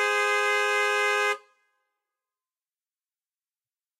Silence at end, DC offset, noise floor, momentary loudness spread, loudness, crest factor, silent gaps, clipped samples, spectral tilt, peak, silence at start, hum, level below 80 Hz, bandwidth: 2.6 s; under 0.1%; under -90 dBFS; 4 LU; -24 LUFS; 16 dB; none; under 0.1%; 3 dB/octave; -14 dBFS; 0 s; none; under -90 dBFS; 16 kHz